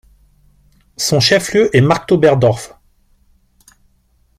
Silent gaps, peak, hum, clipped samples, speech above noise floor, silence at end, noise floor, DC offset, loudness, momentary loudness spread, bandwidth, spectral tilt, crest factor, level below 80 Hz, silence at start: none; 0 dBFS; none; under 0.1%; 44 dB; 1.75 s; -57 dBFS; under 0.1%; -13 LUFS; 9 LU; 15.5 kHz; -5 dB/octave; 16 dB; -48 dBFS; 1 s